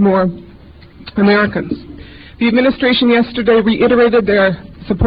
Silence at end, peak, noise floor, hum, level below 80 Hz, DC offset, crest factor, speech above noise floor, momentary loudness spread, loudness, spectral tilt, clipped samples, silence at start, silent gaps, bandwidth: 0 s; -2 dBFS; -39 dBFS; none; -34 dBFS; 0.2%; 12 dB; 27 dB; 13 LU; -13 LUFS; -10 dB/octave; under 0.1%; 0 s; none; 5.2 kHz